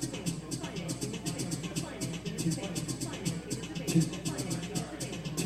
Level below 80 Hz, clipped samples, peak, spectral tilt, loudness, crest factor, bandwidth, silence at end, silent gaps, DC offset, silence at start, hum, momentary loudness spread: -56 dBFS; under 0.1%; -14 dBFS; -4.5 dB/octave; -35 LUFS; 20 dB; 16 kHz; 0 s; none; under 0.1%; 0 s; none; 7 LU